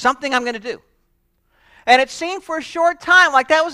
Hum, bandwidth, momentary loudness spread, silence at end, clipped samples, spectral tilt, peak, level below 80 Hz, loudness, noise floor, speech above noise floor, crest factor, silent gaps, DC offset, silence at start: none; 14 kHz; 16 LU; 0 s; under 0.1%; -1.5 dB/octave; 0 dBFS; -56 dBFS; -16 LUFS; -64 dBFS; 48 dB; 18 dB; none; under 0.1%; 0 s